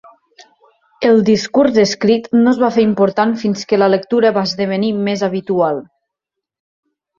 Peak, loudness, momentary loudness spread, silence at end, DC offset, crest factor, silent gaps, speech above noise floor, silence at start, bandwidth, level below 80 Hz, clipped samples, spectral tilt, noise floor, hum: -2 dBFS; -14 LUFS; 5 LU; 1.35 s; under 0.1%; 14 dB; none; 68 dB; 1 s; 7.4 kHz; -56 dBFS; under 0.1%; -5.5 dB/octave; -81 dBFS; none